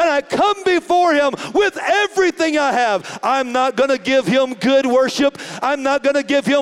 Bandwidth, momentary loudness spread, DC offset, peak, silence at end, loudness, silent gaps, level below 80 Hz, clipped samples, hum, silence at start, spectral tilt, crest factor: 13 kHz; 4 LU; under 0.1%; -4 dBFS; 0 s; -16 LUFS; none; -58 dBFS; under 0.1%; none; 0 s; -4 dB/octave; 12 dB